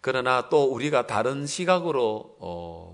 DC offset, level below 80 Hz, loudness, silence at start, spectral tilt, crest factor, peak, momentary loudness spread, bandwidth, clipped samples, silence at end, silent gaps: under 0.1%; -64 dBFS; -24 LUFS; 0.05 s; -4.5 dB/octave; 20 dB; -6 dBFS; 14 LU; 11 kHz; under 0.1%; 0 s; none